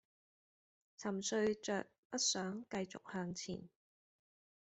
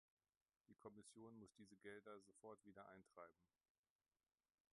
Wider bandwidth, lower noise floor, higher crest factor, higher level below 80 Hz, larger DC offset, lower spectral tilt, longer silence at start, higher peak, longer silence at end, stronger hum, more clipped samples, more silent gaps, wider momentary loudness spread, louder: second, 8.2 kHz vs 11 kHz; about the same, under -90 dBFS vs under -90 dBFS; about the same, 20 dB vs 22 dB; first, -78 dBFS vs under -90 dBFS; neither; second, -3 dB/octave vs -5 dB/octave; first, 1 s vs 0.7 s; first, -22 dBFS vs -44 dBFS; second, 1 s vs 1.25 s; neither; neither; first, 1.98-2.10 s vs none; first, 10 LU vs 5 LU; first, -41 LUFS vs -64 LUFS